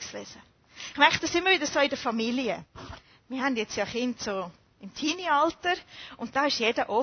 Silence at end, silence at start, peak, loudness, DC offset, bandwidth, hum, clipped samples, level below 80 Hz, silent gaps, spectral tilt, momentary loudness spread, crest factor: 0 s; 0 s; -4 dBFS; -27 LUFS; under 0.1%; 6.6 kHz; none; under 0.1%; -60 dBFS; none; -2.5 dB/octave; 19 LU; 24 dB